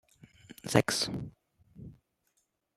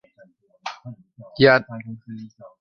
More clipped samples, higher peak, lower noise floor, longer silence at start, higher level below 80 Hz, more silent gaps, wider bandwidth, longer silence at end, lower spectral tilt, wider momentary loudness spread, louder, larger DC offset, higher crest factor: neither; second, -8 dBFS vs -2 dBFS; first, -77 dBFS vs -55 dBFS; second, 0.5 s vs 0.65 s; about the same, -62 dBFS vs -60 dBFS; neither; first, 16 kHz vs 7 kHz; first, 0.85 s vs 0.35 s; second, -4 dB/octave vs -6.5 dB/octave; about the same, 25 LU vs 26 LU; second, -30 LUFS vs -17 LUFS; neither; first, 28 dB vs 22 dB